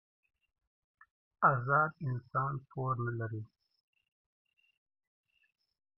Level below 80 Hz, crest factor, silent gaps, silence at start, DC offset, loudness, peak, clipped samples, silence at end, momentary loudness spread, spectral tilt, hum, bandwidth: -76 dBFS; 24 dB; none; 1.4 s; under 0.1%; -33 LUFS; -12 dBFS; under 0.1%; 2.55 s; 12 LU; -9 dB/octave; none; 5.6 kHz